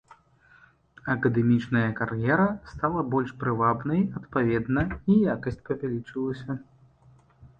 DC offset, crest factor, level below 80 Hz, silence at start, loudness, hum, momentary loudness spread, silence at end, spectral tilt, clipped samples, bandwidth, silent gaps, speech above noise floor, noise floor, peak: under 0.1%; 18 dB; -50 dBFS; 1.05 s; -26 LUFS; none; 9 LU; 0.1 s; -9.5 dB/octave; under 0.1%; 7.2 kHz; none; 33 dB; -58 dBFS; -8 dBFS